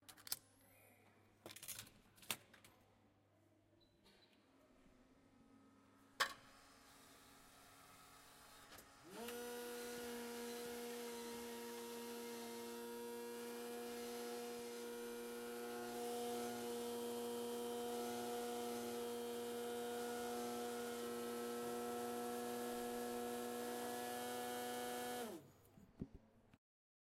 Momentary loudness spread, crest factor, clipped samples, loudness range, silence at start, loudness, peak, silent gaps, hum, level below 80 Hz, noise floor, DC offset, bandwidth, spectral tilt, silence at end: 17 LU; 26 dB; under 0.1%; 9 LU; 0 s; -48 LUFS; -24 dBFS; none; none; -80 dBFS; -75 dBFS; under 0.1%; 16 kHz; -2.5 dB/octave; 0.45 s